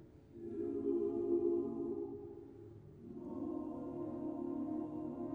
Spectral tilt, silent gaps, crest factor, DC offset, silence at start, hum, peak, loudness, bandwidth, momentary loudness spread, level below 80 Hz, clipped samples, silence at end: -11 dB/octave; none; 16 dB; under 0.1%; 0 s; none; -24 dBFS; -41 LUFS; 2.9 kHz; 18 LU; -68 dBFS; under 0.1%; 0 s